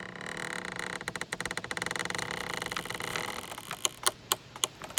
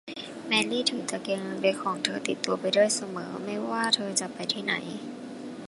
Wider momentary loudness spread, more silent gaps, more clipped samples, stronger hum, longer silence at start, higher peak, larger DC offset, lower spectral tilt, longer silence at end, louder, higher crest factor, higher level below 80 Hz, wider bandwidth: second, 7 LU vs 14 LU; neither; neither; neither; about the same, 0 s vs 0.05 s; about the same, -4 dBFS vs -6 dBFS; neither; about the same, -1.5 dB/octave vs -2.5 dB/octave; about the same, 0 s vs 0 s; second, -34 LUFS vs -28 LUFS; first, 32 dB vs 24 dB; first, -62 dBFS vs -76 dBFS; first, 18 kHz vs 11.5 kHz